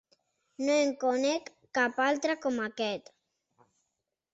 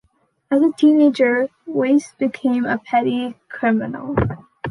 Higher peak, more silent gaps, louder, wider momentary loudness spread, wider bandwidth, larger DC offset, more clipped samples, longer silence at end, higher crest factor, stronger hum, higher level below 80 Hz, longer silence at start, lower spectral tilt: second, -14 dBFS vs -4 dBFS; neither; second, -30 LUFS vs -18 LUFS; about the same, 8 LU vs 10 LU; second, 8.2 kHz vs 11 kHz; neither; neither; first, 1.35 s vs 0 s; about the same, 18 dB vs 14 dB; neither; second, -76 dBFS vs -44 dBFS; about the same, 0.6 s vs 0.5 s; second, -3 dB/octave vs -7 dB/octave